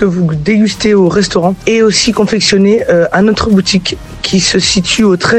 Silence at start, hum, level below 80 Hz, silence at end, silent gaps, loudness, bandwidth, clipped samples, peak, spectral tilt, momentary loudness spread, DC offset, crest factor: 0 s; none; -34 dBFS; 0 s; none; -10 LUFS; 11 kHz; under 0.1%; 0 dBFS; -4.5 dB/octave; 4 LU; 0.2%; 10 dB